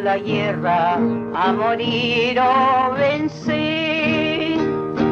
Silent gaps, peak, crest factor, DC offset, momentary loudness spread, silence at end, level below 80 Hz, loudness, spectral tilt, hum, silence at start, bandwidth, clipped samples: none; -6 dBFS; 12 dB; under 0.1%; 5 LU; 0 s; -52 dBFS; -19 LUFS; -6.5 dB/octave; none; 0 s; 7.2 kHz; under 0.1%